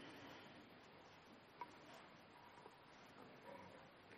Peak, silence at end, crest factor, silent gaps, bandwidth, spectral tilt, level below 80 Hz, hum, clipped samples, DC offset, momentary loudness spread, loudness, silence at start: -38 dBFS; 0 s; 22 dB; none; 15 kHz; -4.5 dB/octave; -86 dBFS; none; under 0.1%; under 0.1%; 6 LU; -61 LUFS; 0 s